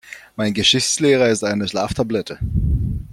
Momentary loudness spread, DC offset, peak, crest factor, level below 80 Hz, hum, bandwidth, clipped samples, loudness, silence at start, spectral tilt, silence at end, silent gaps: 9 LU; under 0.1%; -2 dBFS; 16 dB; -30 dBFS; none; 15.5 kHz; under 0.1%; -18 LUFS; 0.05 s; -4 dB/octave; 0 s; none